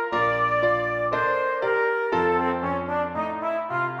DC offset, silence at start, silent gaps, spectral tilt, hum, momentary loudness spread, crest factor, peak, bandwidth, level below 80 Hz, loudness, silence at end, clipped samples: under 0.1%; 0 s; none; -7 dB/octave; none; 5 LU; 14 dB; -10 dBFS; 8 kHz; -56 dBFS; -24 LUFS; 0 s; under 0.1%